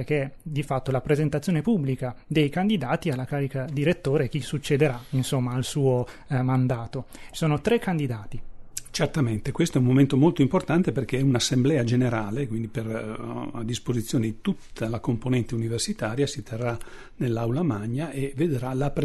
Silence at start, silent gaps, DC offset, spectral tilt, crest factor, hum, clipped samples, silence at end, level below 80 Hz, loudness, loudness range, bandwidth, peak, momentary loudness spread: 0 s; none; under 0.1%; -6.5 dB/octave; 16 dB; none; under 0.1%; 0 s; -46 dBFS; -26 LUFS; 6 LU; 12.5 kHz; -8 dBFS; 9 LU